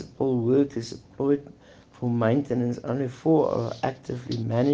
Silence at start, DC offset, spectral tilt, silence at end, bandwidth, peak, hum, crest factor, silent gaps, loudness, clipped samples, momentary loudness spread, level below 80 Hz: 0 s; under 0.1%; -8 dB/octave; 0 s; 8 kHz; -10 dBFS; none; 16 dB; none; -26 LUFS; under 0.1%; 10 LU; -60 dBFS